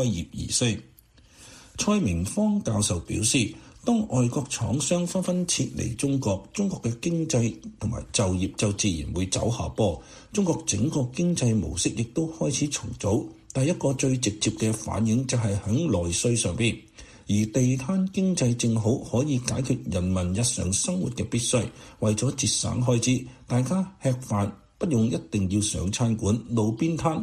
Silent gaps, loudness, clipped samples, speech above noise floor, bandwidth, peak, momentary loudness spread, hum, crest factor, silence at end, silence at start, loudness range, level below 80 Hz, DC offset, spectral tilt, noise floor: none; -26 LUFS; under 0.1%; 30 dB; 13.5 kHz; -8 dBFS; 5 LU; none; 16 dB; 0 s; 0 s; 2 LU; -48 dBFS; under 0.1%; -5 dB/octave; -55 dBFS